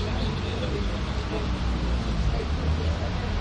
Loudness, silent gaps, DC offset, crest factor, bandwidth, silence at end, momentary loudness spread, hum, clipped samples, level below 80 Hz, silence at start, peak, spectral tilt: -28 LUFS; none; under 0.1%; 14 dB; 9.2 kHz; 0 s; 2 LU; none; under 0.1%; -30 dBFS; 0 s; -14 dBFS; -6.5 dB/octave